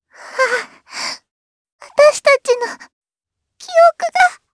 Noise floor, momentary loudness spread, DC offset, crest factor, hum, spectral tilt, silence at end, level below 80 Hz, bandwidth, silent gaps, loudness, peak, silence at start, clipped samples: -81 dBFS; 17 LU; under 0.1%; 16 dB; none; 0.5 dB/octave; 0.2 s; -64 dBFS; 11 kHz; 1.31-1.65 s, 1.72-1.79 s, 2.93-3.01 s; -15 LUFS; 0 dBFS; 0.2 s; under 0.1%